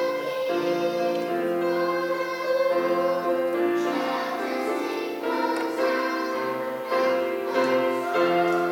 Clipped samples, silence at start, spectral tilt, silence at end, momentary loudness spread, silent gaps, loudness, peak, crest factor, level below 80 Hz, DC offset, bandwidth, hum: under 0.1%; 0 s; -5 dB/octave; 0 s; 5 LU; none; -25 LUFS; -10 dBFS; 14 dB; -72 dBFS; under 0.1%; 18 kHz; none